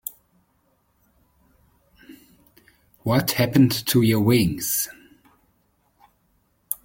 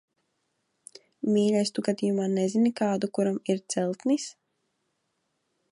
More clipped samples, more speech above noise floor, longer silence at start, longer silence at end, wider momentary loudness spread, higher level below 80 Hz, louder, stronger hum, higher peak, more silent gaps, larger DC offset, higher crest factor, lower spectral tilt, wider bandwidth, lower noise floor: neither; second, 47 dB vs 51 dB; second, 0.05 s vs 1.25 s; second, 0.1 s vs 1.4 s; first, 13 LU vs 6 LU; first, -54 dBFS vs -76 dBFS; first, -21 LUFS vs -27 LUFS; neither; first, -4 dBFS vs -12 dBFS; neither; neither; about the same, 20 dB vs 18 dB; about the same, -5 dB/octave vs -5.5 dB/octave; first, 17 kHz vs 11 kHz; second, -66 dBFS vs -77 dBFS